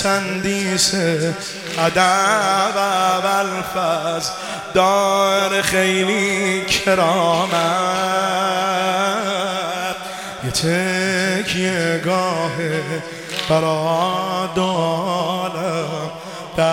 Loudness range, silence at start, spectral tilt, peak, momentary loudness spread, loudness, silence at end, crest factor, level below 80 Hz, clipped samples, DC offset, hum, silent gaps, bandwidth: 3 LU; 0 s; -3.5 dB/octave; 0 dBFS; 8 LU; -18 LUFS; 0 s; 18 dB; -52 dBFS; under 0.1%; under 0.1%; none; none; 17 kHz